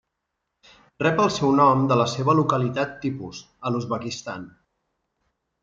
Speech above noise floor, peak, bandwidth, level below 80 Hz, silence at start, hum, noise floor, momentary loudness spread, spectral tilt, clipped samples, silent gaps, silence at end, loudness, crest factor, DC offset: 58 dB; -6 dBFS; 7.6 kHz; -60 dBFS; 1 s; none; -80 dBFS; 16 LU; -6 dB/octave; under 0.1%; none; 1.15 s; -22 LUFS; 18 dB; under 0.1%